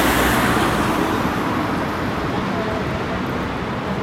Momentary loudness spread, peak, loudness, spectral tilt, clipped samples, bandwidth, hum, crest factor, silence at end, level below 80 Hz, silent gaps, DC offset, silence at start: 7 LU; -4 dBFS; -20 LUFS; -5 dB/octave; under 0.1%; 16.5 kHz; none; 16 dB; 0 s; -36 dBFS; none; under 0.1%; 0 s